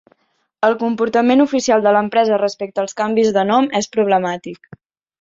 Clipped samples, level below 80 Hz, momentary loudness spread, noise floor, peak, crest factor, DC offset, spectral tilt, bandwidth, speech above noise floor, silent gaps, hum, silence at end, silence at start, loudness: under 0.1%; -62 dBFS; 9 LU; -61 dBFS; -2 dBFS; 14 dB; under 0.1%; -4.5 dB/octave; 7.8 kHz; 45 dB; none; none; 0.65 s; 0.6 s; -16 LUFS